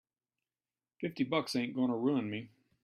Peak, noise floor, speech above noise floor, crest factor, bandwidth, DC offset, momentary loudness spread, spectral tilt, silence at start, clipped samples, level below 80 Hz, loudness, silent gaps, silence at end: -18 dBFS; under -90 dBFS; over 56 dB; 18 dB; 13 kHz; under 0.1%; 10 LU; -6 dB/octave; 1 s; under 0.1%; -78 dBFS; -35 LUFS; none; 0.35 s